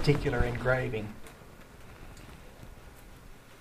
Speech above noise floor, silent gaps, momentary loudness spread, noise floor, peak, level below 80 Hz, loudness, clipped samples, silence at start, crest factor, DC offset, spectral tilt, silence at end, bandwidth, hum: 22 dB; none; 24 LU; -50 dBFS; -10 dBFS; -42 dBFS; -31 LUFS; under 0.1%; 0 s; 22 dB; under 0.1%; -6.5 dB/octave; 0 s; 15.5 kHz; none